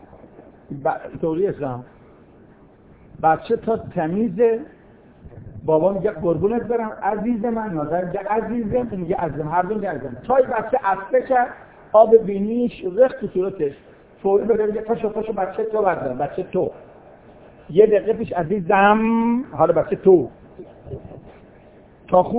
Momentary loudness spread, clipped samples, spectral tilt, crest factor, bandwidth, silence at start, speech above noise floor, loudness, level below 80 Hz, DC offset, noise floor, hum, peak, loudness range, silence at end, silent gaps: 12 LU; under 0.1%; -11 dB/octave; 20 dB; 4 kHz; 0.4 s; 29 dB; -20 LUFS; -50 dBFS; under 0.1%; -49 dBFS; none; 0 dBFS; 5 LU; 0 s; none